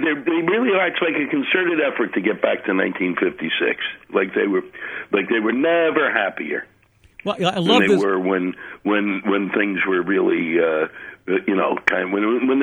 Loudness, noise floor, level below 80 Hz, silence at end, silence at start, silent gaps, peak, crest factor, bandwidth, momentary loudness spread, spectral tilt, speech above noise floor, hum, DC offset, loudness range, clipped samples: -20 LUFS; -47 dBFS; -62 dBFS; 0 s; 0 s; none; -2 dBFS; 18 dB; 10.5 kHz; 7 LU; -6 dB/octave; 27 dB; none; under 0.1%; 2 LU; under 0.1%